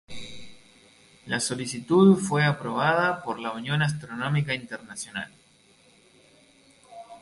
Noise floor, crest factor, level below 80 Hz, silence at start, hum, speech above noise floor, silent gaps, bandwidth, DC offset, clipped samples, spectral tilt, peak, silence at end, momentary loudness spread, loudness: -59 dBFS; 20 dB; -62 dBFS; 0.1 s; none; 34 dB; none; 11.5 kHz; under 0.1%; under 0.1%; -5.5 dB/octave; -6 dBFS; 0.05 s; 22 LU; -25 LUFS